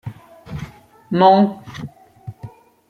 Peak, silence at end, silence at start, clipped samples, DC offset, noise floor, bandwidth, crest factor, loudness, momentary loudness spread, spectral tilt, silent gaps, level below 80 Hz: -2 dBFS; 0.4 s; 0.05 s; under 0.1%; under 0.1%; -40 dBFS; 6.8 kHz; 18 dB; -15 LUFS; 26 LU; -8 dB/octave; none; -52 dBFS